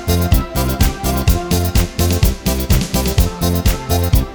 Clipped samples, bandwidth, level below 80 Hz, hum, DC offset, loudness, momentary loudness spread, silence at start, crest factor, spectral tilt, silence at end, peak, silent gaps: under 0.1%; over 20 kHz; -18 dBFS; none; under 0.1%; -16 LUFS; 2 LU; 0 s; 14 dB; -5 dB/octave; 0 s; 0 dBFS; none